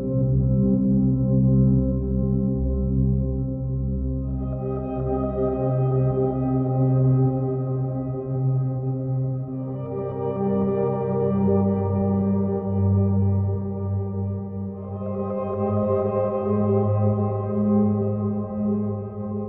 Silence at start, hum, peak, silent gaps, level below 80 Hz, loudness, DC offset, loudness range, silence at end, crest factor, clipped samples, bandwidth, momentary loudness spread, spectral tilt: 0 s; none; -8 dBFS; none; -36 dBFS; -23 LUFS; under 0.1%; 3 LU; 0 s; 14 dB; under 0.1%; 2.8 kHz; 8 LU; -13.5 dB/octave